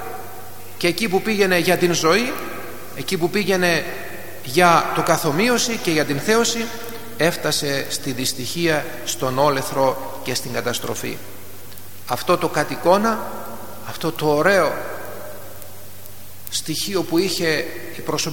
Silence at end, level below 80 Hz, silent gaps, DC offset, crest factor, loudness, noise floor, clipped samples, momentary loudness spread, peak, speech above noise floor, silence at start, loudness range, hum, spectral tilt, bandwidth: 0 s; -56 dBFS; none; 3%; 20 dB; -20 LUFS; -40 dBFS; under 0.1%; 19 LU; 0 dBFS; 21 dB; 0 s; 5 LU; none; -3.5 dB/octave; 17.5 kHz